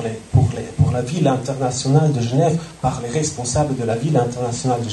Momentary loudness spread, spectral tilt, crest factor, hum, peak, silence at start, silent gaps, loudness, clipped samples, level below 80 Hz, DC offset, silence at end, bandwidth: 5 LU; -6 dB/octave; 16 dB; none; -4 dBFS; 0 s; none; -19 LUFS; under 0.1%; -40 dBFS; under 0.1%; 0 s; 11.5 kHz